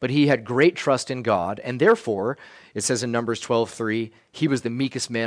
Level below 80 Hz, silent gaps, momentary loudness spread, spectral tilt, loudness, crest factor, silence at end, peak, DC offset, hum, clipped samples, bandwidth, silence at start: -64 dBFS; none; 9 LU; -5 dB/octave; -23 LUFS; 18 dB; 0 s; -6 dBFS; under 0.1%; none; under 0.1%; 10.5 kHz; 0 s